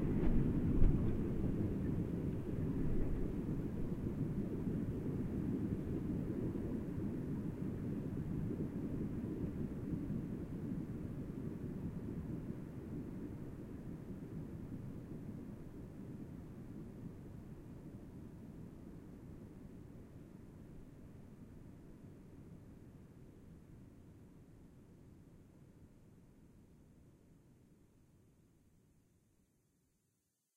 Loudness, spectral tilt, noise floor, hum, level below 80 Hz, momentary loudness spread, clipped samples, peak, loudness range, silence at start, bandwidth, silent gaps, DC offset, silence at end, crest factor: -42 LUFS; -10 dB/octave; -84 dBFS; none; -48 dBFS; 20 LU; under 0.1%; -16 dBFS; 20 LU; 0 s; 10.5 kHz; none; under 0.1%; 2.85 s; 26 dB